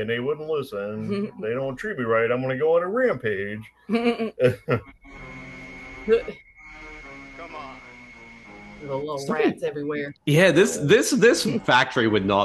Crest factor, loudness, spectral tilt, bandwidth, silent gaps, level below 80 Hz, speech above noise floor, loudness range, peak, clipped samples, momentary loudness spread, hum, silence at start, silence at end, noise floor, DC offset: 20 dB; -22 LUFS; -5 dB/octave; 12.5 kHz; none; -54 dBFS; 23 dB; 11 LU; -4 dBFS; under 0.1%; 22 LU; none; 0 s; 0 s; -45 dBFS; under 0.1%